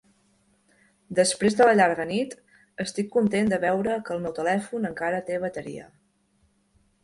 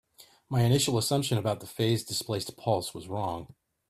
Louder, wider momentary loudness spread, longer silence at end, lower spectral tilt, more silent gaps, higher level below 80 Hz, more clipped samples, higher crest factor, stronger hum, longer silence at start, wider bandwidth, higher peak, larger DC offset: first, -24 LUFS vs -29 LUFS; first, 15 LU vs 9 LU; first, 1.2 s vs 0.45 s; about the same, -4.5 dB/octave vs -5 dB/octave; neither; about the same, -62 dBFS vs -60 dBFS; neither; about the same, 20 dB vs 18 dB; neither; first, 1.1 s vs 0.2 s; second, 11.5 kHz vs 15.5 kHz; first, -6 dBFS vs -12 dBFS; neither